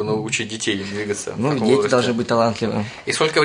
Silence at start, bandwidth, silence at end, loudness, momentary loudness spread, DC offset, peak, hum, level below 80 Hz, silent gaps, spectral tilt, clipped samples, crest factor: 0 s; 11 kHz; 0 s; -20 LUFS; 8 LU; under 0.1%; -4 dBFS; none; -56 dBFS; none; -4.5 dB/octave; under 0.1%; 16 dB